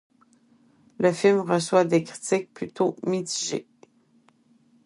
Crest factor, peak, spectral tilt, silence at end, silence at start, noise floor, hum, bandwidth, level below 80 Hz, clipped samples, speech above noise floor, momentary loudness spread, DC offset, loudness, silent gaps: 20 dB; -6 dBFS; -4.5 dB/octave; 1.25 s; 1 s; -62 dBFS; none; 11.5 kHz; -72 dBFS; under 0.1%; 38 dB; 8 LU; under 0.1%; -24 LUFS; none